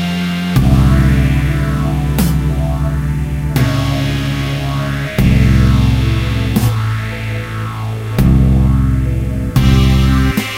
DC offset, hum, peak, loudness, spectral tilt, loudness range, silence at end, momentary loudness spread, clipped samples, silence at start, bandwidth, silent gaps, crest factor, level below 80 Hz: under 0.1%; none; 0 dBFS; -14 LUFS; -6.5 dB/octave; 2 LU; 0 s; 8 LU; under 0.1%; 0 s; 16 kHz; none; 12 dB; -18 dBFS